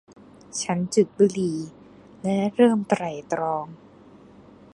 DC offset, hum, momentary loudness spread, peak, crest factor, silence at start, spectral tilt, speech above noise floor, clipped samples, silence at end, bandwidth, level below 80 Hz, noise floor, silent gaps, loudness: under 0.1%; none; 14 LU; -6 dBFS; 20 dB; 0.55 s; -5.5 dB/octave; 27 dB; under 0.1%; 1 s; 11.5 kHz; -64 dBFS; -49 dBFS; none; -24 LUFS